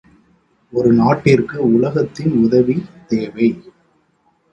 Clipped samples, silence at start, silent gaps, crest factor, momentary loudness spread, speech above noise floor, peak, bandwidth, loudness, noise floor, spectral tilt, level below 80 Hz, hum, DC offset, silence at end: under 0.1%; 0.75 s; none; 16 dB; 9 LU; 45 dB; 0 dBFS; 8.2 kHz; -16 LUFS; -60 dBFS; -8.5 dB/octave; -50 dBFS; none; under 0.1%; 0.9 s